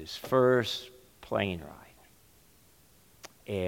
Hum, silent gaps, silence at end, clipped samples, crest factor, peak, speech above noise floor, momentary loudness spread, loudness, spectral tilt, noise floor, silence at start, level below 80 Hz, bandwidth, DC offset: none; none; 0 s; under 0.1%; 20 dB; -12 dBFS; 33 dB; 26 LU; -29 LUFS; -5.5 dB/octave; -62 dBFS; 0 s; -62 dBFS; 17 kHz; under 0.1%